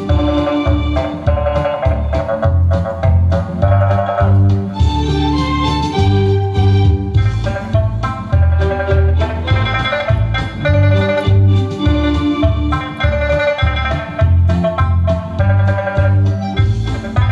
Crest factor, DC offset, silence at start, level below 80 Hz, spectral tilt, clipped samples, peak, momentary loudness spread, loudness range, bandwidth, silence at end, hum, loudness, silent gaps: 12 dB; under 0.1%; 0 s; -22 dBFS; -8 dB/octave; under 0.1%; 0 dBFS; 5 LU; 1 LU; 7.2 kHz; 0 s; none; -15 LUFS; none